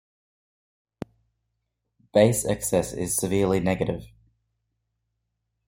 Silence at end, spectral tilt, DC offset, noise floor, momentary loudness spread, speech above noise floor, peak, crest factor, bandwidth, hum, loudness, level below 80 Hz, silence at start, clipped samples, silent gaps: 1.6 s; -5 dB/octave; under 0.1%; -79 dBFS; 21 LU; 56 dB; -4 dBFS; 24 dB; 16.5 kHz; none; -24 LUFS; -52 dBFS; 2.15 s; under 0.1%; none